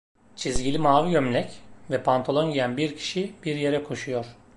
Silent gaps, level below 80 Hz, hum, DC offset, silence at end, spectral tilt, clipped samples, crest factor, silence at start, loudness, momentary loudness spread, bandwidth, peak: none; -48 dBFS; none; under 0.1%; 0 s; -5.5 dB/octave; under 0.1%; 20 dB; 0.15 s; -25 LUFS; 10 LU; 11.5 kHz; -6 dBFS